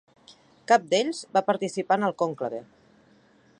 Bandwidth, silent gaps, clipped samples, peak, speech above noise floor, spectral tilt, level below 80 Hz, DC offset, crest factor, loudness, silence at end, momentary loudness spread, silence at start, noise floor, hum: 10.5 kHz; none; under 0.1%; -6 dBFS; 34 dB; -4 dB/octave; -78 dBFS; under 0.1%; 20 dB; -25 LUFS; 0.95 s; 12 LU; 0.3 s; -59 dBFS; none